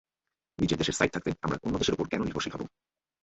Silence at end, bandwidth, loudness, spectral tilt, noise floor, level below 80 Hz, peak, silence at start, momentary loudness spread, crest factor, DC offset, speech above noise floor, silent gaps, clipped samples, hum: 0.55 s; 8.4 kHz; -30 LUFS; -4.5 dB/octave; -89 dBFS; -52 dBFS; -8 dBFS; 0.6 s; 8 LU; 24 dB; under 0.1%; 59 dB; none; under 0.1%; none